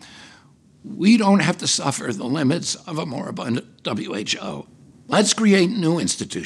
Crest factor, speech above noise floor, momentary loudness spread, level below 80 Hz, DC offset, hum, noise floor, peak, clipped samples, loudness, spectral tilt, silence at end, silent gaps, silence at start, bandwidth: 18 dB; 31 dB; 12 LU; -64 dBFS; under 0.1%; none; -52 dBFS; -4 dBFS; under 0.1%; -20 LUFS; -4 dB/octave; 0 s; none; 0.05 s; 12.5 kHz